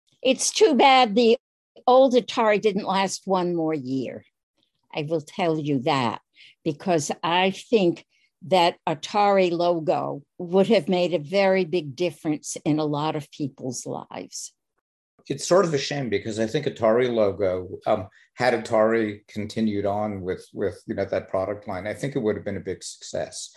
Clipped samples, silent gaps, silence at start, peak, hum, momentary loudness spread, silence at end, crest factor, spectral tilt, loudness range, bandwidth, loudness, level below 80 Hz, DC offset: under 0.1%; 1.40-1.75 s, 4.43-4.54 s, 14.81-15.18 s; 0.25 s; -4 dBFS; none; 13 LU; 0.1 s; 18 dB; -4.5 dB/octave; 6 LU; 12.5 kHz; -23 LUFS; -58 dBFS; under 0.1%